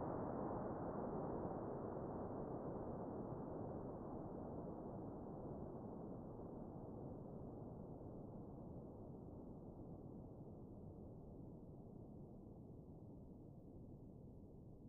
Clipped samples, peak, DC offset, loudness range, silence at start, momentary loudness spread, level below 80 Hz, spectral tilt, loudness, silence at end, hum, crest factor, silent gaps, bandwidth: under 0.1%; -34 dBFS; under 0.1%; 10 LU; 0 s; 12 LU; -64 dBFS; -8 dB/octave; -52 LUFS; 0 s; none; 16 dB; none; 2.3 kHz